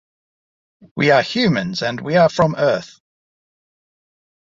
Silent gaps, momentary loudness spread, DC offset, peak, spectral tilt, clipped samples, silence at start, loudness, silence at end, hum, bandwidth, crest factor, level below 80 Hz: none; 8 LU; under 0.1%; -2 dBFS; -6 dB/octave; under 0.1%; 0.95 s; -17 LUFS; 1.65 s; none; 7.8 kHz; 18 dB; -56 dBFS